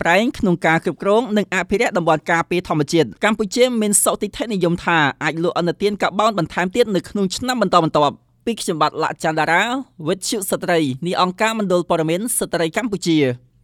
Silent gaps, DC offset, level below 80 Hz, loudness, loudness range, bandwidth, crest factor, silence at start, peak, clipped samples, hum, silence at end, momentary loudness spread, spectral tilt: none; under 0.1%; -50 dBFS; -18 LUFS; 2 LU; 17.5 kHz; 18 dB; 0 s; 0 dBFS; under 0.1%; none; 0.25 s; 5 LU; -4 dB/octave